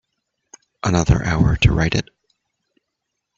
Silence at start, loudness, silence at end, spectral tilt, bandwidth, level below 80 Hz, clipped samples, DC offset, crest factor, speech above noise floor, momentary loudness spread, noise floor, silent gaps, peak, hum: 0.85 s; -18 LUFS; 1.35 s; -5.5 dB/octave; 7.8 kHz; -30 dBFS; under 0.1%; under 0.1%; 20 dB; 62 dB; 9 LU; -78 dBFS; none; -2 dBFS; none